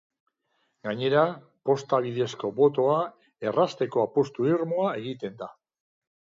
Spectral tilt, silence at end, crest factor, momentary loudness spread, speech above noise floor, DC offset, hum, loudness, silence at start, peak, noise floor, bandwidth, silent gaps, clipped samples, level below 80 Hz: -6.5 dB/octave; 0.85 s; 18 dB; 12 LU; 49 dB; under 0.1%; none; -26 LUFS; 0.85 s; -10 dBFS; -74 dBFS; 7.6 kHz; none; under 0.1%; -74 dBFS